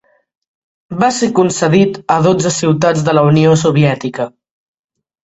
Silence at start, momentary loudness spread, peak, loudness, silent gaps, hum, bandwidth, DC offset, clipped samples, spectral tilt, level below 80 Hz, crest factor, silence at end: 0.9 s; 10 LU; 0 dBFS; -12 LUFS; none; none; 8.2 kHz; under 0.1%; under 0.1%; -6 dB/octave; -50 dBFS; 14 dB; 0.95 s